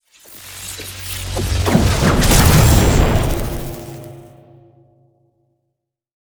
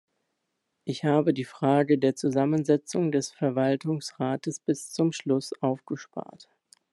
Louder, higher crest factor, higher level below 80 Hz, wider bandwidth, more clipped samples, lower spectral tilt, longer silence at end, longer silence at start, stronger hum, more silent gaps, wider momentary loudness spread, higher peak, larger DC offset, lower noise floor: first, -15 LUFS vs -27 LUFS; about the same, 16 dB vs 18 dB; first, -22 dBFS vs -74 dBFS; first, over 20 kHz vs 12 kHz; neither; about the same, -5 dB/octave vs -6 dB/octave; first, 2 s vs 0.5 s; second, 0.3 s vs 0.85 s; neither; neither; first, 22 LU vs 11 LU; first, 0 dBFS vs -8 dBFS; neither; second, -75 dBFS vs -80 dBFS